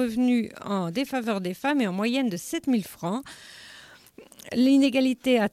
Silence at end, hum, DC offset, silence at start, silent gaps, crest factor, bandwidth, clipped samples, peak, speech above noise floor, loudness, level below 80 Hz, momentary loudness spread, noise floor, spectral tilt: 0.05 s; none; under 0.1%; 0 s; none; 14 dB; 15.5 kHz; under 0.1%; -10 dBFS; 26 dB; -25 LUFS; -64 dBFS; 22 LU; -50 dBFS; -5 dB/octave